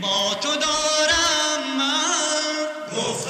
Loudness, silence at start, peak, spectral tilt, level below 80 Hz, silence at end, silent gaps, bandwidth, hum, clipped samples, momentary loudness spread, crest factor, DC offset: -20 LUFS; 0 s; -8 dBFS; -1 dB/octave; -52 dBFS; 0 s; none; 14 kHz; none; under 0.1%; 8 LU; 14 dB; under 0.1%